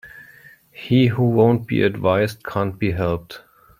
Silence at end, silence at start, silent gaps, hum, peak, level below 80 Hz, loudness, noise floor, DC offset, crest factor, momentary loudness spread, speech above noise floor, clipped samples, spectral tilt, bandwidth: 0.4 s; 0.05 s; none; none; -2 dBFS; -50 dBFS; -19 LUFS; -48 dBFS; under 0.1%; 18 dB; 14 LU; 29 dB; under 0.1%; -8 dB/octave; 16 kHz